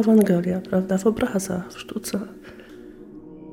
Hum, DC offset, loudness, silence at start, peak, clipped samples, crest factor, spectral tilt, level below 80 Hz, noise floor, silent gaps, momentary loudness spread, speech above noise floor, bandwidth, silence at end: none; under 0.1%; -23 LUFS; 0 s; -6 dBFS; under 0.1%; 16 dB; -6.5 dB/octave; -52 dBFS; -42 dBFS; none; 23 LU; 21 dB; 17 kHz; 0 s